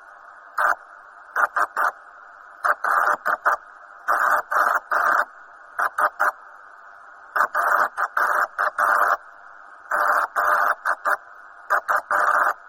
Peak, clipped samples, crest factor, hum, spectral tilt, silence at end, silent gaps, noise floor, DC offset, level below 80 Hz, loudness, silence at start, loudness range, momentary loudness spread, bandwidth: -4 dBFS; under 0.1%; 18 dB; none; -1 dB/octave; 0.15 s; none; -45 dBFS; under 0.1%; -70 dBFS; -21 LUFS; 0.3 s; 2 LU; 7 LU; 16.5 kHz